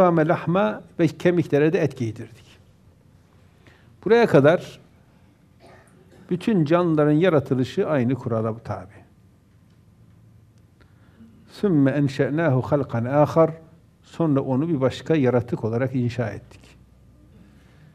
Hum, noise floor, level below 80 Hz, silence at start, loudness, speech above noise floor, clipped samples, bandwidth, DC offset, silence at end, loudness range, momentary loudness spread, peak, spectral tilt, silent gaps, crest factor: none; -55 dBFS; -60 dBFS; 0 s; -21 LUFS; 34 dB; under 0.1%; 13 kHz; under 0.1%; 1.55 s; 6 LU; 13 LU; -2 dBFS; -8 dB/octave; none; 20 dB